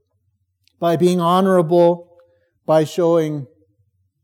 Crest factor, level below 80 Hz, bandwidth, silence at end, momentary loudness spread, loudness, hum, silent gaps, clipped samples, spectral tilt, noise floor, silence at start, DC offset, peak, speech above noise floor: 16 dB; -76 dBFS; 16.5 kHz; 0.8 s; 11 LU; -17 LUFS; none; none; under 0.1%; -7 dB/octave; -67 dBFS; 0.8 s; under 0.1%; -4 dBFS; 52 dB